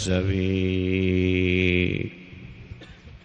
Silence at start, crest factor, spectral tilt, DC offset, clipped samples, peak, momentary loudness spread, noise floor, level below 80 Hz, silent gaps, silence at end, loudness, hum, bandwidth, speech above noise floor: 0 s; 16 dB; -6.5 dB/octave; under 0.1%; under 0.1%; -8 dBFS; 22 LU; -45 dBFS; -44 dBFS; none; 0.05 s; -23 LUFS; none; 9.4 kHz; 22 dB